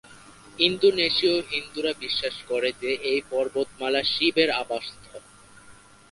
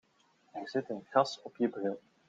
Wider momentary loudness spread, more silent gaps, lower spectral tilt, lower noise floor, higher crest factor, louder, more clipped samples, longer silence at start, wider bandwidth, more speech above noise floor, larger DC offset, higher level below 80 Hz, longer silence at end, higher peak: about the same, 10 LU vs 11 LU; neither; second, -3.5 dB/octave vs -5.5 dB/octave; second, -51 dBFS vs -70 dBFS; about the same, 22 dB vs 24 dB; first, -24 LUFS vs -34 LUFS; neither; second, 0.1 s vs 0.55 s; first, 11.5 kHz vs 9.2 kHz; second, 26 dB vs 36 dB; neither; first, -60 dBFS vs -84 dBFS; about the same, 0.4 s vs 0.3 s; first, -4 dBFS vs -12 dBFS